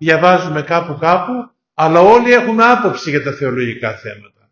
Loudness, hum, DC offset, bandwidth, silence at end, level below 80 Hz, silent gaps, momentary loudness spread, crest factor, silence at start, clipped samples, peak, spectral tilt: -13 LUFS; none; under 0.1%; 7.2 kHz; 0.35 s; -52 dBFS; none; 15 LU; 14 dB; 0 s; 0.3%; 0 dBFS; -6 dB/octave